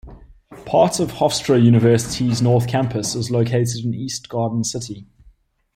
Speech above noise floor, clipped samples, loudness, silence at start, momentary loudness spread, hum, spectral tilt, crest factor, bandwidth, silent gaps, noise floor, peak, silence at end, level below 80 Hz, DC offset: 35 dB; under 0.1%; -18 LUFS; 0.05 s; 11 LU; none; -6 dB/octave; 16 dB; 14 kHz; none; -53 dBFS; -2 dBFS; 0.7 s; -48 dBFS; under 0.1%